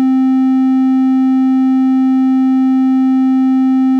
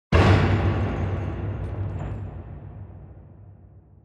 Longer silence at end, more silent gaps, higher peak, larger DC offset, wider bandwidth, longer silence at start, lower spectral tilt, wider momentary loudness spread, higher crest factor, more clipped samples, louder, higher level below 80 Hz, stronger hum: second, 0 s vs 0.25 s; neither; about the same, -6 dBFS vs -6 dBFS; neither; second, 4.7 kHz vs 8.2 kHz; about the same, 0 s vs 0.1 s; about the same, -6.5 dB/octave vs -7.5 dB/octave; second, 0 LU vs 24 LU; second, 4 dB vs 20 dB; neither; first, -12 LUFS vs -24 LUFS; second, under -90 dBFS vs -34 dBFS; neither